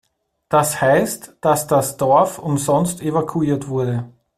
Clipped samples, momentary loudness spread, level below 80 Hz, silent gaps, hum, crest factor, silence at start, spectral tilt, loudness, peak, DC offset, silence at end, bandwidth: under 0.1%; 6 LU; -54 dBFS; none; none; 18 dB; 0.5 s; -5.5 dB/octave; -18 LUFS; -2 dBFS; under 0.1%; 0.3 s; 16 kHz